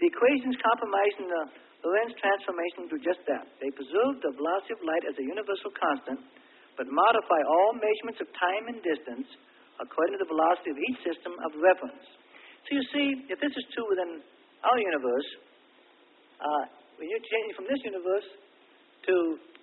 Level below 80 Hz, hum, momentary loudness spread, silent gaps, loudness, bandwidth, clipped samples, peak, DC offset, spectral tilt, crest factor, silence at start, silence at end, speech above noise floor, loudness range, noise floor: -80 dBFS; none; 13 LU; none; -29 LUFS; 4.2 kHz; under 0.1%; -8 dBFS; under 0.1%; -7.5 dB/octave; 20 dB; 0 s; 0.2 s; 31 dB; 4 LU; -60 dBFS